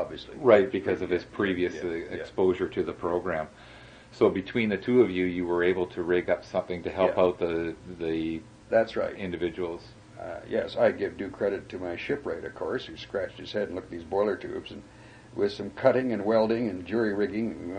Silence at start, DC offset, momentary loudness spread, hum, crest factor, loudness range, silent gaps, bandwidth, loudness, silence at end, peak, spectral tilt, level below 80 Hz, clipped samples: 0 s; under 0.1%; 12 LU; none; 22 dB; 6 LU; none; 9.6 kHz; -28 LUFS; 0 s; -6 dBFS; -7 dB/octave; -58 dBFS; under 0.1%